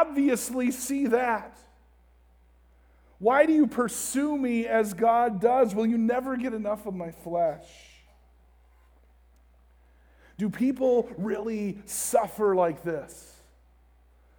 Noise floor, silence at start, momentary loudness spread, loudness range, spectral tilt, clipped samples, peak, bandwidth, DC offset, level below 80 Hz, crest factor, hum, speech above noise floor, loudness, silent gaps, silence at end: -59 dBFS; 0 s; 10 LU; 11 LU; -5 dB/octave; under 0.1%; -8 dBFS; over 20 kHz; under 0.1%; -60 dBFS; 20 dB; none; 33 dB; -26 LUFS; none; 1.15 s